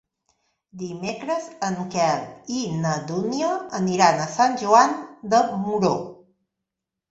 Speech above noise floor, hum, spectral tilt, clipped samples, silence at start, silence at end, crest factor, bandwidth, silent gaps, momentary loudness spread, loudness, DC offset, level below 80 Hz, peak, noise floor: 63 dB; none; -5 dB/octave; under 0.1%; 0.75 s; 0.95 s; 22 dB; 8.2 kHz; none; 13 LU; -22 LUFS; under 0.1%; -64 dBFS; -2 dBFS; -84 dBFS